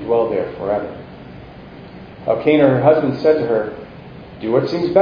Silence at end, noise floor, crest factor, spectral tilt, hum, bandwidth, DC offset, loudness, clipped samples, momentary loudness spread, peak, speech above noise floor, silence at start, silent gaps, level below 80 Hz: 0 s; -37 dBFS; 18 dB; -9 dB/octave; none; 5.4 kHz; under 0.1%; -17 LUFS; under 0.1%; 24 LU; 0 dBFS; 21 dB; 0 s; none; -48 dBFS